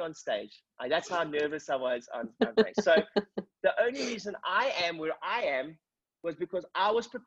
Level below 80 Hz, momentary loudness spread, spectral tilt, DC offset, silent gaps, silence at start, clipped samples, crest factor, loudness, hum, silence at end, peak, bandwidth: -72 dBFS; 12 LU; -4 dB/octave; under 0.1%; none; 0 s; under 0.1%; 20 dB; -31 LUFS; none; 0.05 s; -10 dBFS; 8.2 kHz